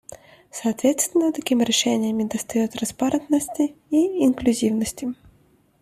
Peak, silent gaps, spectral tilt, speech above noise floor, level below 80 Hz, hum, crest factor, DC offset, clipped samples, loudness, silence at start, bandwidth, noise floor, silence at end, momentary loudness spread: -6 dBFS; none; -3.5 dB/octave; 37 dB; -56 dBFS; none; 16 dB; under 0.1%; under 0.1%; -22 LUFS; 0.1 s; 15 kHz; -59 dBFS; 0.7 s; 8 LU